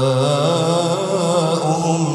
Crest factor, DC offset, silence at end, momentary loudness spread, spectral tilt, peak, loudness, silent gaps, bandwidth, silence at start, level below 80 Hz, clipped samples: 12 dB; under 0.1%; 0 s; 2 LU; -5.5 dB/octave; -4 dBFS; -17 LUFS; none; 13 kHz; 0 s; -64 dBFS; under 0.1%